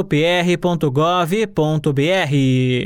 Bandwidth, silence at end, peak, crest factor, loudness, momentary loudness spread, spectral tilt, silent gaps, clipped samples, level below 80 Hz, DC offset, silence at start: 16.5 kHz; 0 s; -6 dBFS; 10 dB; -17 LUFS; 2 LU; -6.5 dB/octave; none; under 0.1%; -48 dBFS; under 0.1%; 0 s